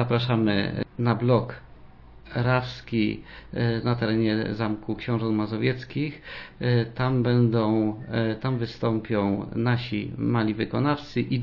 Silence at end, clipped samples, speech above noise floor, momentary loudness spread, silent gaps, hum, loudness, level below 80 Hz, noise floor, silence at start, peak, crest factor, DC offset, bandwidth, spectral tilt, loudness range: 0 s; under 0.1%; 22 dB; 8 LU; none; none; -26 LUFS; -50 dBFS; -47 dBFS; 0 s; -8 dBFS; 16 dB; under 0.1%; 6 kHz; -9 dB/octave; 2 LU